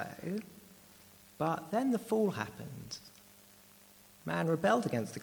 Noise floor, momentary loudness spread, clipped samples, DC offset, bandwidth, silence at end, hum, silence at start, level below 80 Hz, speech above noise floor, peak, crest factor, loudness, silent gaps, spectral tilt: -60 dBFS; 19 LU; under 0.1%; under 0.1%; over 20 kHz; 0 s; none; 0 s; -72 dBFS; 26 dB; -16 dBFS; 20 dB; -34 LUFS; none; -6 dB/octave